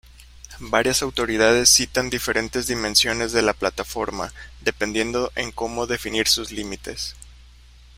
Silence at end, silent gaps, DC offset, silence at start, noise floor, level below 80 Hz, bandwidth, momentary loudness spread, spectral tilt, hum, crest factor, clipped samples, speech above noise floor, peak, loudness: 0.5 s; none; under 0.1%; 0.2 s; -47 dBFS; -42 dBFS; 16 kHz; 15 LU; -2 dB/octave; none; 22 dB; under 0.1%; 25 dB; -2 dBFS; -21 LUFS